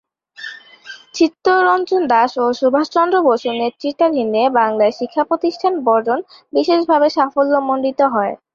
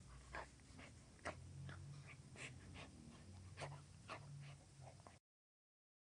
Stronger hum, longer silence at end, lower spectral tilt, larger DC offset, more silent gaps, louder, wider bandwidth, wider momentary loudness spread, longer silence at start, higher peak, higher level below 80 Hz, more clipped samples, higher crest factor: neither; second, 0.2 s vs 1 s; about the same, -4.5 dB/octave vs -4.5 dB/octave; neither; neither; first, -16 LUFS vs -57 LUFS; second, 7.4 kHz vs 10.5 kHz; about the same, 9 LU vs 8 LU; first, 0.4 s vs 0 s; first, -2 dBFS vs -32 dBFS; first, -64 dBFS vs -70 dBFS; neither; second, 14 dB vs 24 dB